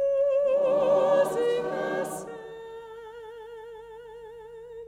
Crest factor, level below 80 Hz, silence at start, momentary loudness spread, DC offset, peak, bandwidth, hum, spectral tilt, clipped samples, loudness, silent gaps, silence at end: 16 dB; -64 dBFS; 0 s; 22 LU; under 0.1%; -12 dBFS; 15.5 kHz; 50 Hz at -65 dBFS; -4.5 dB/octave; under 0.1%; -25 LUFS; none; 0 s